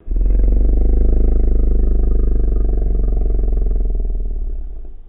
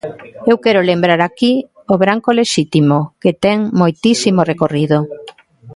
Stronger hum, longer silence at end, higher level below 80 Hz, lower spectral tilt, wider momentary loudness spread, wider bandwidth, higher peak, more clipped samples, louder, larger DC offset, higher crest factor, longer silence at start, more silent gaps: neither; about the same, 0 s vs 0.05 s; first, -14 dBFS vs -54 dBFS; first, -14.5 dB/octave vs -5.5 dB/octave; first, 9 LU vs 5 LU; second, 1.7 kHz vs 11.5 kHz; second, -4 dBFS vs 0 dBFS; neither; second, -20 LUFS vs -14 LUFS; neither; about the same, 10 dB vs 14 dB; about the same, 0.05 s vs 0.05 s; neither